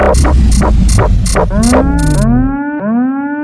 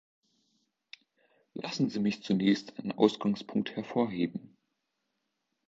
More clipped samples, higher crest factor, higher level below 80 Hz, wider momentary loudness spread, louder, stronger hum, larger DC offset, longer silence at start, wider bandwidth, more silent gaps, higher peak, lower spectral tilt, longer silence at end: first, 0.2% vs under 0.1%; second, 10 dB vs 24 dB; first, -12 dBFS vs -72 dBFS; second, 5 LU vs 12 LU; first, -11 LUFS vs -31 LUFS; neither; neither; second, 0 s vs 1.55 s; first, 11 kHz vs 7.8 kHz; neither; first, 0 dBFS vs -10 dBFS; about the same, -6 dB/octave vs -6.5 dB/octave; second, 0 s vs 1.2 s